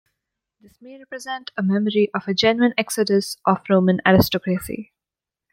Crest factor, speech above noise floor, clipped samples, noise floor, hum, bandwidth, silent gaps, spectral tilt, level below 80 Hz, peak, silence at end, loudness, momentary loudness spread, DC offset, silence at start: 18 dB; 68 dB; under 0.1%; -88 dBFS; none; 16.5 kHz; none; -5.5 dB/octave; -50 dBFS; -2 dBFS; 0.7 s; -20 LUFS; 15 LU; under 0.1%; 0.85 s